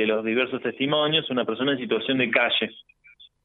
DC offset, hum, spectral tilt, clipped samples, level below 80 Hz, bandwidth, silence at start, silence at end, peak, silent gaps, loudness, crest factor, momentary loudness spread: under 0.1%; none; -8 dB/octave; under 0.1%; -70 dBFS; 4.2 kHz; 0 s; 0.2 s; -6 dBFS; none; -23 LUFS; 20 dB; 6 LU